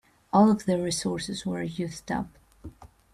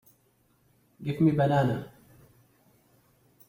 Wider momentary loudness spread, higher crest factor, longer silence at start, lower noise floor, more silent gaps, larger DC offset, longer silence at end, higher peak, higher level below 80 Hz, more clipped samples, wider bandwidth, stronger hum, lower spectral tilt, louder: about the same, 17 LU vs 15 LU; about the same, 18 dB vs 18 dB; second, 0.35 s vs 1 s; second, -47 dBFS vs -67 dBFS; neither; neither; second, 0.3 s vs 1.6 s; first, -8 dBFS vs -12 dBFS; first, -56 dBFS vs -64 dBFS; neither; second, 13 kHz vs 16 kHz; neither; second, -5.5 dB/octave vs -8.5 dB/octave; about the same, -27 LUFS vs -27 LUFS